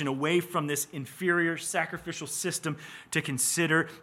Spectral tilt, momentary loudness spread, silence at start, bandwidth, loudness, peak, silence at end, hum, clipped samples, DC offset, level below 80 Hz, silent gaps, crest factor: -3.5 dB/octave; 9 LU; 0 s; 16.5 kHz; -29 LUFS; -12 dBFS; 0 s; none; under 0.1%; under 0.1%; -70 dBFS; none; 18 dB